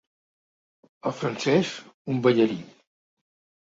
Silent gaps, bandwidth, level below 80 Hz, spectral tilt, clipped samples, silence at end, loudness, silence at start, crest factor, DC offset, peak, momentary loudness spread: 1.94-2.05 s; 7.8 kHz; -68 dBFS; -6 dB/octave; under 0.1%; 0.95 s; -25 LUFS; 1.05 s; 20 dB; under 0.1%; -6 dBFS; 13 LU